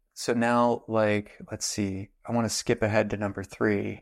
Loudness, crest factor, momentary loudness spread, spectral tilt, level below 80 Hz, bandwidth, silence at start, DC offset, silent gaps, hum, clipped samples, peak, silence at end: -27 LUFS; 16 dB; 8 LU; -5 dB/octave; -56 dBFS; 15.5 kHz; 0.15 s; under 0.1%; none; none; under 0.1%; -10 dBFS; 0 s